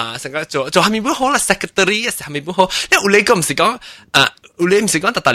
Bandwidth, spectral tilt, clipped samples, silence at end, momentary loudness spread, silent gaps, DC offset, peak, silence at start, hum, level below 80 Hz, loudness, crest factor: 16 kHz; -3 dB/octave; under 0.1%; 0 s; 9 LU; none; under 0.1%; 0 dBFS; 0 s; none; -48 dBFS; -15 LUFS; 16 dB